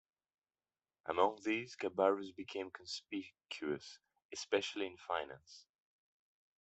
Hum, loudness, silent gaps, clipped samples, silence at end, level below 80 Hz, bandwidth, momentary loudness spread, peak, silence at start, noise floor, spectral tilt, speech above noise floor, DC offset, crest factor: none; -39 LUFS; 4.25-4.29 s; under 0.1%; 1 s; -82 dBFS; 8.2 kHz; 16 LU; -16 dBFS; 1.05 s; under -90 dBFS; -3.5 dB/octave; over 51 dB; under 0.1%; 24 dB